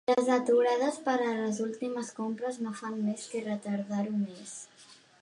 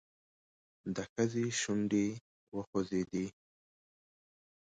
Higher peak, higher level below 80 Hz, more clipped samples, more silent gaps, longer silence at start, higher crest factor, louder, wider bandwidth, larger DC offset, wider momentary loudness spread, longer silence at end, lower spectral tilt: first, -14 dBFS vs -18 dBFS; second, -82 dBFS vs -68 dBFS; neither; second, none vs 1.09-1.16 s, 2.21-2.52 s, 2.67-2.73 s; second, 0.1 s vs 0.85 s; about the same, 18 dB vs 20 dB; first, -31 LUFS vs -36 LUFS; first, 11 kHz vs 9.4 kHz; neither; about the same, 11 LU vs 12 LU; second, 0.25 s vs 1.45 s; about the same, -5 dB/octave vs -5 dB/octave